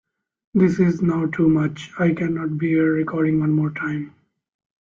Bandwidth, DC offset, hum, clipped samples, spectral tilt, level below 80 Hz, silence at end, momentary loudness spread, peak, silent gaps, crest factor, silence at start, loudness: 7.4 kHz; under 0.1%; none; under 0.1%; -9 dB/octave; -56 dBFS; 0.75 s; 8 LU; -6 dBFS; none; 14 dB; 0.55 s; -20 LUFS